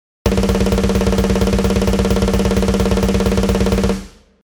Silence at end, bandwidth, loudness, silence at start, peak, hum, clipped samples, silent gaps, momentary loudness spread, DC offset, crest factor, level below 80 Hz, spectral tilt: 0.35 s; over 20 kHz; -16 LUFS; 0.25 s; 0 dBFS; none; under 0.1%; none; 2 LU; under 0.1%; 16 dB; -22 dBFS; -6 dB/octave